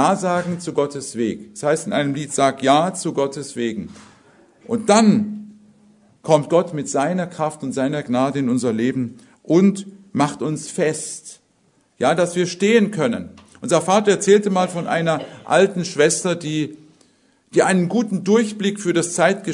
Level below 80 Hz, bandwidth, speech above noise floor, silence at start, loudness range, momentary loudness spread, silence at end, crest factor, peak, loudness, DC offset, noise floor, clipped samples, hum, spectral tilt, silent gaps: -64 dBFS; 11 kHz; 42 dB; 0 s; 3 LU; 11 LU; 0 s; 20 dB; 0 dBFS; -19 LUFS; under 0.1%; -61 dBFS; under 0.1%; none; -5 dB/octave; none